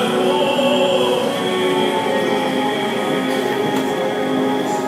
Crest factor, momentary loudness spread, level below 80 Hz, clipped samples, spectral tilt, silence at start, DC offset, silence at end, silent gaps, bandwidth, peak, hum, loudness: 12 dB; 4 LU; -60 dBFS; under 0.1%; -4.5 dB/octave; 0 s; under 0.1%; 0 s; none; 16 kHz; -4 dBFS; none; -18 LUFS